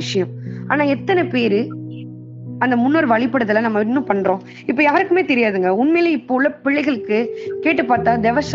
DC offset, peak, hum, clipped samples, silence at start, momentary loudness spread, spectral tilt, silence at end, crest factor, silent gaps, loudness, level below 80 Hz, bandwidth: under 0.1%; -2 dBFS; none; under 0.1%; 0 s; 11 LU; -4.5 dB/octave; 0 s; 16 dB; none; -17 LUFS; -58 dBFS; 7.6 kHz